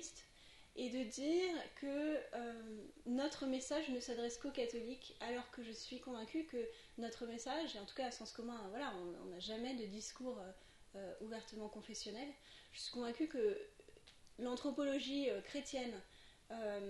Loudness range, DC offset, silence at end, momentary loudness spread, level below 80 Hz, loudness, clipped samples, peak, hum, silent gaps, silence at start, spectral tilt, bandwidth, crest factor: 6 LU; under 0.1%; 0 s; 14 LU; -70 dBFS; -45 LUFS; under 0.1%; -28 dBFS; none; none; 0 s; -3.5 dB/octave; 11.5 kHz; 18 dB